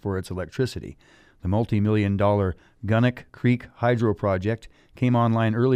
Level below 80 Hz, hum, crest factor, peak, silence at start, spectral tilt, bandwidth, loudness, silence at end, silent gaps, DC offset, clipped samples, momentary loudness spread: -50 dBFS; none; 16 dB; -6 dBFS; 0.05 s; -8.5 dB/octave; 11 kHz; -24 LUFS; 0 s; none; under 0.1%; under 0.1%; 11 LU